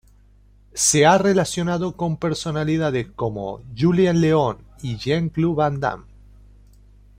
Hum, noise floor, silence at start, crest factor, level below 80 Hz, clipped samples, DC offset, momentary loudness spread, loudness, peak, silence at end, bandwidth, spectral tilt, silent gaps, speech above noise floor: 50 Hz at -45 dBFS; -52 dBFS; 0.75 s; 18 dB; -48 dBFS; under 0.1%; under 0.1%; 14 LU; -20 LUFS; -2 dBFS; 1.2 s; 16 kHz; -5 dB/octave; none; 32 dB